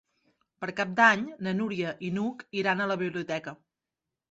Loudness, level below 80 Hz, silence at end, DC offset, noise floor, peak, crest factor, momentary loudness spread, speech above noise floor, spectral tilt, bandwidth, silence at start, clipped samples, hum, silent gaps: -28 LUFS; -70 dBFS; 0.75 s; under 0.1%; -88 dBFS; -6 dBFS; 24 dB; 14 LU; 60 dB; -5.5 dB/octave; 8 kHz; 0.6 s; under 0.1%; none; none